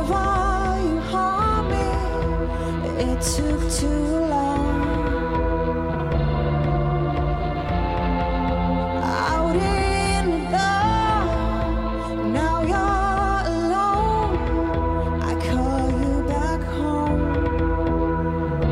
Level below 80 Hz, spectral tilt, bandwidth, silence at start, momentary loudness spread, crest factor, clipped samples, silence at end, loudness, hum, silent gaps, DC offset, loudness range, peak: -28 dBFS; -6 dB/octave; 13.5 kHz; 0 s; 4 LU; 12 dB; under 0.1%; 0 s; -22 LUFS; none; none; under 0.1%; 2 LU; -8 dBFS